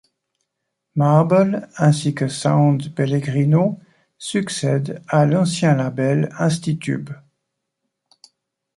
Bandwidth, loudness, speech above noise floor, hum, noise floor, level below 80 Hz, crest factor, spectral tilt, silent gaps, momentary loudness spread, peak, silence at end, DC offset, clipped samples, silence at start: 11.5 kHz; -19 LUFS; 60 dB; none; -78 dBFS; -60 dBFS; 16 dB; -6.5 dB/octave; none; 9 LU; -2 dBFS; 1.6 s; under 0.1%; under 0.1%; 0.95 s